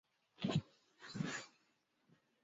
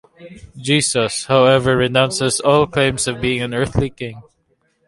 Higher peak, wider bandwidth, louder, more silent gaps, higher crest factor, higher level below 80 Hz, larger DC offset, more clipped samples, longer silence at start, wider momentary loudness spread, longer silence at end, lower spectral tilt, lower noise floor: second, -24 dBFS vs 0 dBFS; second, 7.6 kHz vs 11.5 kHz; second, -44 LUFS vs -16 LUFS; neither; about the same, 22 dB vs 18 dB; second, -74 dBFS vs -42 dBFS; neither; neither; first, 0.4 s vs 0.2 s; first, 17 LU vs 9 LU; first, 0.95 s vs 0.65 s; about the same, -5 dB/octave vs -4 dB/octave; first, -80 dBFS vs -64 dBFS